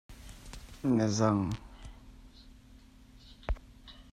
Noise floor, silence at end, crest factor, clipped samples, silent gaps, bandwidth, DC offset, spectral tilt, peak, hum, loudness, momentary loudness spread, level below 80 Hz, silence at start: -56 dBFS; 0.1 s; 22 dB; under 0.1%; none; 14 kHz; under 0.1%; -6 dB/octave; -14 dBFS; none; -32 LUFS; 24 LU; -46 dBFS; 0.1 s